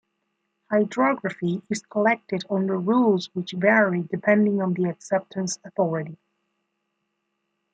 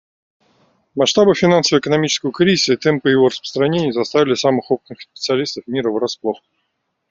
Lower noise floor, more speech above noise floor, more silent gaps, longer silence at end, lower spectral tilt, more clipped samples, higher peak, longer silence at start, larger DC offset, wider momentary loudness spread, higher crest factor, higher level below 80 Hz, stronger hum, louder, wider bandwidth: first, -77 dBFS vs -71 dBFS; about the same, 54 dB vs 55 dB; neither; first, 1.6 s vs 0.75 s; first, -6 dB/octave vs -4.5 dB/octave; neither; second, -6 dBFS vs -2 dBFS; second, 0.7 s vs 0.95 s; neither; about the same, 9 LU vs 10 LU; about the same, 18 dB vs 16 dB; second, -72 dBFS vs -58 dBFS; neither; second, -23 LUFS vs -16 LUFS; first, 9.2 kHz vs 7.8 kHz